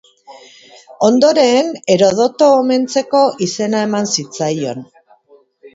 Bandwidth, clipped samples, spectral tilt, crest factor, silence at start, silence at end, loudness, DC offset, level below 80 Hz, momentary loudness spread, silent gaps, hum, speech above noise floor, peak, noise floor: 8 kHz; under 0.1%; -4.5 dB/octave; 14 dB; 0.3 s; 0.05 s; -14 LUFS; under 0.1%; -62 dBFS; 8 LU; none; none; 36 dB; 0 dBFS; -50 dBFS